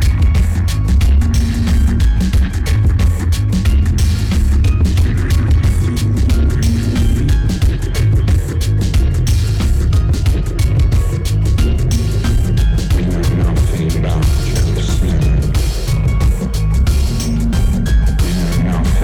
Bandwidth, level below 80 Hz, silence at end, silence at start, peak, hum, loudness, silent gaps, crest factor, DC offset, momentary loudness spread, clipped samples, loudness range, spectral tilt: 16 kHz; -14 dBFS; 0 s; 0 s; -4 dBFS; none; -15 LUFS; none; 8 dB; under 0.1%; 3 LU; under 0.1%; 1 LU; -6.5 dB/octave